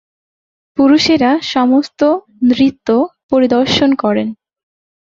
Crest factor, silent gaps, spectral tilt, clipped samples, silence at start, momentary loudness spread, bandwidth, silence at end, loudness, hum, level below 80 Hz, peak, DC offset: 14 dB; 3.23-3.29 s; -5 dB/octave; under 0.1%; 0.75 s; 6 LU; 7.6 kHz; 0.8 s; -13 LUFS; none; -48 dBFS; 0 dBFS; under 0.1%